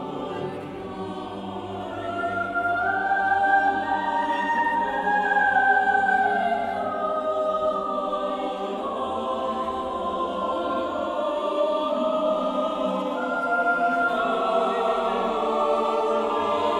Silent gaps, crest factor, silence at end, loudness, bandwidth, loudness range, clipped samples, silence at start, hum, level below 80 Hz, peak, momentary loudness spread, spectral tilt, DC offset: none; 16 dB; 0 s; -24 LUFS; 11.5 kHz; 5 LU; under 0.1%; 0 s; none; -56 dBFS; -8 dBFS; 11 LU; -5 dB/octave; under 0.1%